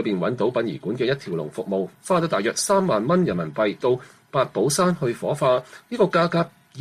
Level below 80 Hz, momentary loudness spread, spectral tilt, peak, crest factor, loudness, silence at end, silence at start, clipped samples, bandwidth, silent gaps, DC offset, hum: -60 dBFS; 7 LU; -5 dB/octave; -8 dBFS; 16 dB; -23 LUFS; 0 s; 0 s; under 0.1%; 15 kHz; none; under 0.1%; none